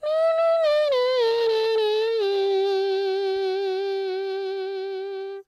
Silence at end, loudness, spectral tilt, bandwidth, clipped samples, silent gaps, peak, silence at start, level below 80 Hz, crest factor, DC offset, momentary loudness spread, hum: 0.05 s; -23 LUFS; -2.5 dB/octave; 12 kHz; under 0.1%; none; -14 dBFS; 0 s; -72 dBFS; 10 dB; under 0.1%; 9 LU; none